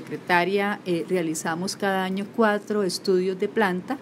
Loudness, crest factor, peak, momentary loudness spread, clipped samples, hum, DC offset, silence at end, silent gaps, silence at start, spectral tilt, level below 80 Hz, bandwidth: -24 LUFS; 20 dB; -4 dBFS; 5 LU; under 0.1%; none; under 0.1%; 0 s; none; 0 s; -4.5 dB/octave; -74 dBFS; 16 kHz